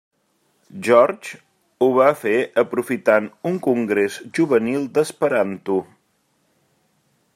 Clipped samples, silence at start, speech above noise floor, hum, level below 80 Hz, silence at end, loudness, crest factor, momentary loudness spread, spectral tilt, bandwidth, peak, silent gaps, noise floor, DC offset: under 0.1%; 0.75 s; 47 dB; none; -70 dBFS; 1.5 s; -19 LUFS; 18 dB; 9 LU; -6 dB/octave; 15 kHz; -2 dBFS; none; -66 dBFS; under 0.1%